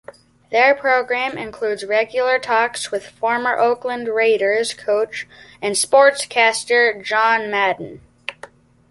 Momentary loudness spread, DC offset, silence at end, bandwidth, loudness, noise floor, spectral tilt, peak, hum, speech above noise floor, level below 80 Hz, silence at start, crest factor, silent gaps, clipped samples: 12 LU; under 0.1%; 0.45 s; 12 kHz; -18 LUFS; -43 dBFS; -1.5 dB/octave; -2 dBFS; none; 25 dB; -62 dBFS; 0.5 s; 18 dB; none; under 0.1%